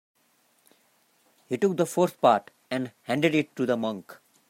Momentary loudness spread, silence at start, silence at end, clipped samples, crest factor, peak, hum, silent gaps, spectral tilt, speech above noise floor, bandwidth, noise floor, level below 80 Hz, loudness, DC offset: 11 LU; 1.5 s; 0.35 s; under 0.1%; 20 dB; -8 dBFS; none; none; -5.5 dB/octave; 41 dB; 16 kHz; -67 dBFS; -74 dBFS; -26 LUFS; under 0.1%